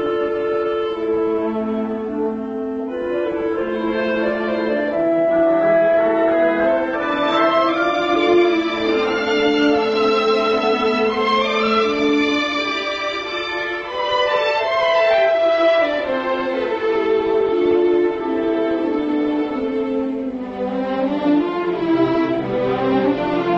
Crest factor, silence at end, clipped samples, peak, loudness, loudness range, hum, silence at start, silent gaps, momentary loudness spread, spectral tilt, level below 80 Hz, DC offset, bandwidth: 14 dB; 0 s; under 0.1%; -4 dBFS; -18 LUFS; 5 LU; none; 0 s; none; 7 LU; -5.5 dB/octave; -52 dBFS; under 0.1%; 7.6 kHz